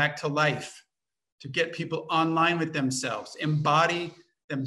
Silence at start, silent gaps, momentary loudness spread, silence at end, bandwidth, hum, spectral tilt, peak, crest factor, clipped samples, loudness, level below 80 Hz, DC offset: 0 s; 1.32-1.38 s, 4.44-4.48 s; 13 LU; 0 s; 12.5 kHz; none; -4.5 dB/octave; -10 dBFS; 18 dB; under 0.1%; -27 LUFS; -72 dBFS; under 0.1%